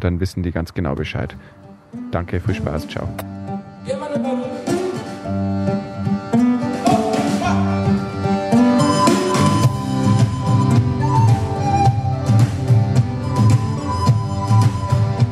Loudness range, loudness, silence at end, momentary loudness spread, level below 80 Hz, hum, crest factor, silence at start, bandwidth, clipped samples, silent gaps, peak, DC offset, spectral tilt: 9 LU; -18 LUFS; 0 s; 11 LU; -40 dBFS; none; 16 dB; 0 s; 13 kHz; under 0.1%; none; -2 dBFS; under 0.1%; -7 dB/octave